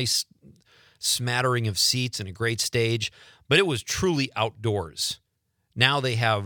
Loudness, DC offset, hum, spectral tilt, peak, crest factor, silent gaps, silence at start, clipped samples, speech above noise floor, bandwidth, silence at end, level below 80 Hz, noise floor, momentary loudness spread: -24 LUFS; under 0.1%; none; -3.5 dB/octave; -2 dBFS; 24 dB; none; 0 s; under 0.1%; 49 dB; 19.5 kHz; 0 s; -58 dBFS; -74 dBFS; 8 LU